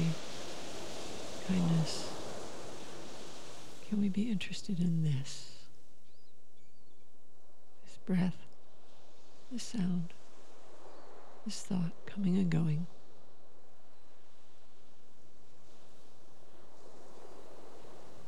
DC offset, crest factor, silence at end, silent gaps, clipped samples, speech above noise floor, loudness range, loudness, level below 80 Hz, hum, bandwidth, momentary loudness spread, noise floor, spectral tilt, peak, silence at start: 2%; 18 dB; 0 s; none; under 0.1%; 35 dB; 6 LU; -37 LUFS; -72 dBFS; none; 12.5 kHz; 24 LU; -69 dBFS; -6 dB/octave; -22 dBFS; 0 s